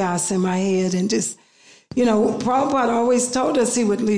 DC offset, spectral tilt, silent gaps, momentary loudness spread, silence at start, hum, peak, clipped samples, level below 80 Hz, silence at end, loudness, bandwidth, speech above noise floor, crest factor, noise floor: 0.2%; -5 dB/octave; none; 4 LU; 0 s; none; -8 dBFS; under 0.1%; -56 dBFS; 0 s; -20 LUFS; 10.5 kHz; 29 dB; 12 dB; -48 dBFS